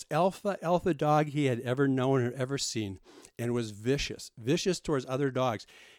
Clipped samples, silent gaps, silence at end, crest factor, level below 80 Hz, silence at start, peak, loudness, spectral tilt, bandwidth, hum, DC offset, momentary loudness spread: under 0.1%; none; 0.35 s; 16 dB; -56 dBFS; 0 s; -14 dBFS; -30 LUFS; -5.5 dB/octave; 16.5 kHz; none; under 0.1%; 10 LU